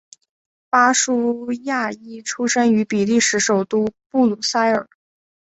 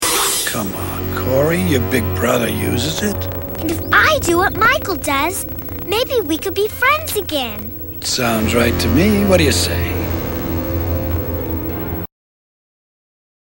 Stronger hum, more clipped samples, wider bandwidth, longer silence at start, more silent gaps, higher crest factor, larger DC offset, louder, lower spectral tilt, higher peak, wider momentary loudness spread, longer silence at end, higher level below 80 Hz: neither; neither; second, 8.2 kHz vs 17 kHz; first, 0.75 s vs 0 s; first, 4.06-4.10 s vs none; about the same, 18 dB vs 18 dB; neither; about the same, -18 LUFS vs -17 LUFS; about the same, -3 dB/octave vs -4 dB/octave; about the same, -2 dBFS vs 0 dBFS; about the same, 8 LU vs 10 LU; second, 0.75 s vs 1.35 s; second, -62 dBFS vs -32 dBFS